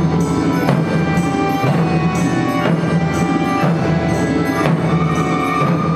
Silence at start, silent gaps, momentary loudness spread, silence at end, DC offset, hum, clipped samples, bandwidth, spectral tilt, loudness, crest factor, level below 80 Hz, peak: 0 s; none; 1 LU; 0 s; under 0.1%; none; under 0.1%; 15 kHz; -7 dB/octave; -16 LUFS; 16 dB; -38 dBFS; 0 dBFS